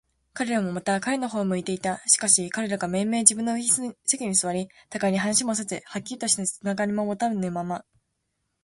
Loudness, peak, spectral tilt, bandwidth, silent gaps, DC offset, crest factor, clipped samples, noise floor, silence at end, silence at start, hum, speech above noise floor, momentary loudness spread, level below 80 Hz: -24 LUFS; 0 dBFS; -3 dB/octave; 12 kHz; none; under 0.1%; 26 dB; under 0.1%; -77 dBFS; 0.85 s; 0.35 s; none; 52 dB; 13 LU; -64 dBFS